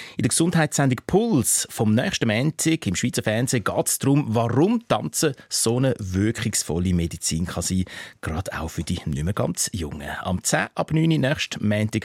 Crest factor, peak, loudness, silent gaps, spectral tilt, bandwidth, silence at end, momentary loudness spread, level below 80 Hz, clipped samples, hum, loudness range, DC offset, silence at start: 16 dB; -6 dBFS; -23 LUFS; none; -4.5 dB/octave; 16.5 kHz; 0 s; 8 LU; -44 dBFS; under 0.1%; none; 5 LU; under 0.1%; 0 s